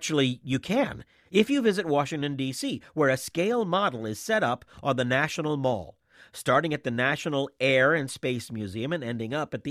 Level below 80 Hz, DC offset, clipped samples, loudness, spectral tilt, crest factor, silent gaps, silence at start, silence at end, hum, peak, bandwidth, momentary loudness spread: -62 dBFS; under 0.1%; under 0.1%; -27 LUFS; -5 dB/octave; 20 dB; none; 0 s; 0 s; none; -8 dBFS; 15.5 kHz; 8 LU